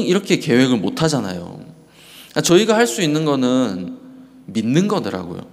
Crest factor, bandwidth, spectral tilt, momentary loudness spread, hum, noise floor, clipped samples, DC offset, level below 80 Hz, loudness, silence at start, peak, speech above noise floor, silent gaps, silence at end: 18 dB; 16 kHz; -5 dB/octave; 15 LU; none; -44 dBFS; under 0.1%; under 0.1%; -56 dBFS; -17 LUFS; 0 s; -2 dBFS; 26 dB; none; 0.05 s